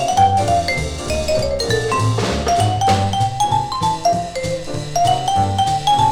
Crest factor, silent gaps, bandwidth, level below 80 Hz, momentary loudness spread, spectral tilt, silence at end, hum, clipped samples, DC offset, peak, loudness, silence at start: 14 dB; none; 16.5 kHz; -34 dBFS; 7 LU; -4.5 dB/octave; 0 s; none; under 0.1%; under 0.1%; -2 dBFS; -18 LUFS; 0 s